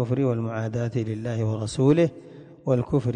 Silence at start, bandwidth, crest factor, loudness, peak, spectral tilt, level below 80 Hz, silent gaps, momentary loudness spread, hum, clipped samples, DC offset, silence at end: 0 s; 9.8 kHz; 16 dB; -25 LUFS; -8 dBFS; -8 dB/octave; -52 dBFS; none; 8 LU; none; under 0.1%; under 0.1%; 0 s